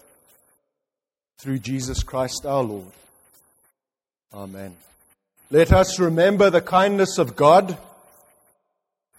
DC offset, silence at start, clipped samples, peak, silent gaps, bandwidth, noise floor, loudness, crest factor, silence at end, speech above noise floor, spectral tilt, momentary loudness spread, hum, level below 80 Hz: under 0.1%; 1.45 s; under 0.1%; 0 dBFS; none; 16 kHz; under -90 dBFS; -19 LUFS; 22 dB; 1.4 s; over 71 dB; -5.5 dB/octave; 22 LU; none; -38 dBFS